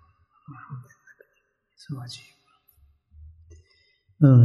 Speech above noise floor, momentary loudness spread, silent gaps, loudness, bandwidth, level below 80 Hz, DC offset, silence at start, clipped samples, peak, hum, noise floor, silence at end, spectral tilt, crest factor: 33 dB; 31 LU; none; -24 LUFS; 7.2 kHz; -60 dBFS; under 0.1%; 0.7 s; under 0.1%; -6 dBFS; none; -72 dBFS; 0 s; -9.5 dB/octave; 20 dB